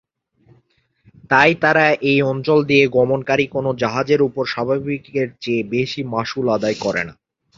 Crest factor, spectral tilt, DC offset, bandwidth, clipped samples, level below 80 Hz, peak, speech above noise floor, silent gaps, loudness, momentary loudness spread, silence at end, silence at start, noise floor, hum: 18 dB; -6 dB/octave; under 0.1%; 7.6 kHz; under 0.1%; -54 dBFS; -2 dBFS; 43 dB; none; -18 LUFS; 9 LU; 0.45 s; 1.3 s; -61 dBFS; none